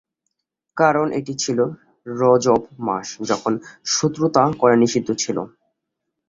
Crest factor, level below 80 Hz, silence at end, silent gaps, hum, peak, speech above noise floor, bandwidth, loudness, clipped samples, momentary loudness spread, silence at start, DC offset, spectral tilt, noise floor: 18 dB; -58 dBFS; 0.8 s; none; none; -2 dBFS; 60 dB; 7.8 kHz; -19 LUFS; under 0.1%; 11 LU; 0.75 s; under 0.1%; -4.5 dB/octave; -79 dBFS